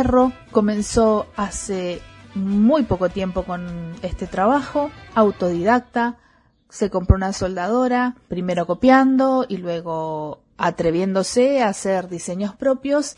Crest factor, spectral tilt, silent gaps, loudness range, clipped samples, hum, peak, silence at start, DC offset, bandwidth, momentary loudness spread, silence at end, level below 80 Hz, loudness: 20 dB; -6 dB/octave; none; 3 LU; under 0.1%; none; 0 dBFS; 0 s; under 0.1%; 11 kHz; 11 LU; 0.05 s; -38 dBFS; -20 LUFS